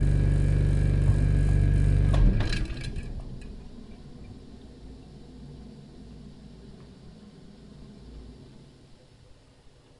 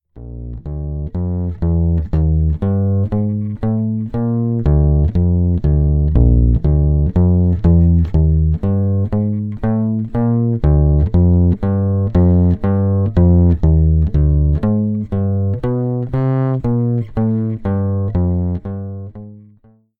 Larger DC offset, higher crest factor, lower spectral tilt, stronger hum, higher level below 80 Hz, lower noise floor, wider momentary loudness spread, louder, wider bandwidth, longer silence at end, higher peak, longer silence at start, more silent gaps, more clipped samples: neither; about the same, 16 dB vs 14 dB; second, -7.5 dB/octave vs -12.5 dB/octave; neither; second, -30 dBFS vs -20 dBFS; first, -54 dBFS vs -50 dBFS; first, 25 LU vs 8 LU; second, -25 LUFS vs -16 LUFS; first, 10.5 kHz vs 2.4 kHz; first, 1.55 s vs 0.6 s; second, -10 dBFS vs 0 dBFS; second, 0 s vs 0.15 s; neither; neither